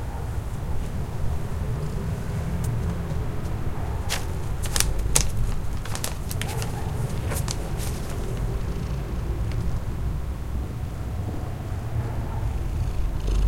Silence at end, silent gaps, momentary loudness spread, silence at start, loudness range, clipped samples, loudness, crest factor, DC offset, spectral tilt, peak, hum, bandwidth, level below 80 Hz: 0 s; none; 6 LU; 0 s; 4 LU; under 0.1%; -29 LUFS; 26 dB; under 0.1%; -4.5 dB/octave; 0 dBFS; none; 16.5 kHz; -30 dBFS